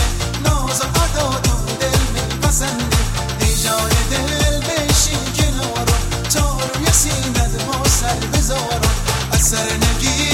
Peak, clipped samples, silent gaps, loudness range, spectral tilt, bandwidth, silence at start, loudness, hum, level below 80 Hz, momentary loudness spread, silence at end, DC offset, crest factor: -2 dBFS; under 0.1%; none; 1 LU; -3.5 dB/octave; 16.5 kHz; 0 s; -17 LUFS; none; -22 dBFS; 4 LU; 0 s; under 0.1%; 16 dB